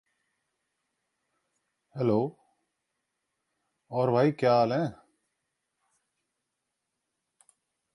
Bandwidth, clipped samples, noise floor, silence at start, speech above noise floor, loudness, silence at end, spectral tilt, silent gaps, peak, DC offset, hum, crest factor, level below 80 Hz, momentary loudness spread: 11.5 kHz; under 0.1%; -84 dBFS; 1.95 s; 59 dB; -27 LUFS; 3 s; -8 dB/octave; none; -12 dBFS; under 0.1%; none; 20 dB; -74 dBFS; 12 LU